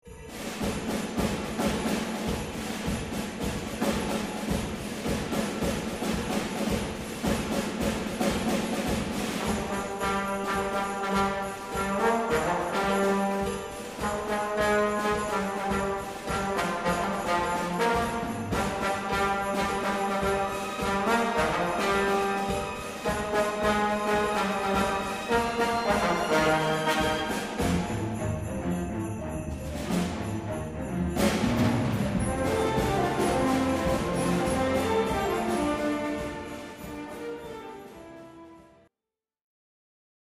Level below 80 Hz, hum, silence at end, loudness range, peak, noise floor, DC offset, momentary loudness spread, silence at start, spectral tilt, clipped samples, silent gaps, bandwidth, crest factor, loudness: -44 dBFS; none; 1.6 s; 5 LU; -10 dBFS; under -90 dBFS; under 0.1%; 8 LU; 0.05 s; -5 dB/octave; under 0.1%; none; 15.5 kHz; 18 dB; -28 LUFS